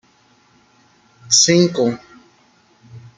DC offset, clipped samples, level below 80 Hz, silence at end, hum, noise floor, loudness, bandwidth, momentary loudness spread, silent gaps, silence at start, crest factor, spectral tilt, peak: under 0.1%; under 0.1%; -62 dBFS; 0.2 s; none; -55 dBFS; -14 LUFS; 11 kHz; 11 LU; none; 1.3 s; 20 dB; -3 dB/octave; -2 dBFS